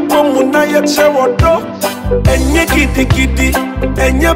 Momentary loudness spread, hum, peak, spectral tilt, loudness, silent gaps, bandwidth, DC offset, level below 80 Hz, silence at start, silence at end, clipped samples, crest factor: 5 LU; none; 0 dBFS; -5 dB/octave; -11 LUFS; none; 16.5 kHz; under 0.1%; -18 dBFS; 0 s; 0 s; under 0.1%; 10 dB